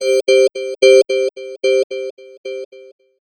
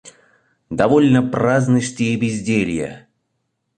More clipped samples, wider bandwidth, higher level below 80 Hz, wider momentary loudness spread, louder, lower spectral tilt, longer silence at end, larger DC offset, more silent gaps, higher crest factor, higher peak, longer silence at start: neither; first, 13 kHz vs 9.4 kHz; second, -80 dBFS vs -50 dBFS; first, 20 LU vs 11 LU; first, -14 LUFS vs -17 LUFS; second, -1 dB/octave vs -6.5 dB/octave; second, 0.45 s vs 0.8 s; neither; first, 1.84-1.90 s, 2.11-2.17 s, 2.38-2.44 s, 2.65-2.71 s vs none; about the same, 16 dB vs 18 dB; about the same, 0 dBFS vs 0 dBFS; about the same, 0 s vs 0.05 s